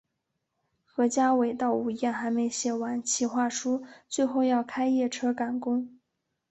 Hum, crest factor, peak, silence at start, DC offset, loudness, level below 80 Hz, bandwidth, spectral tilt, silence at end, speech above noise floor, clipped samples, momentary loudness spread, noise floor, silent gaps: none; 14 dB; -14 dBFS; 0.95 s; under 0.1%; -28 LUFS; -74 dBFS; 8.4 kHz; -3 dB/octave; 0.55 s; 54 dB; under 0.1%; 7 LU; -81 dBFS; none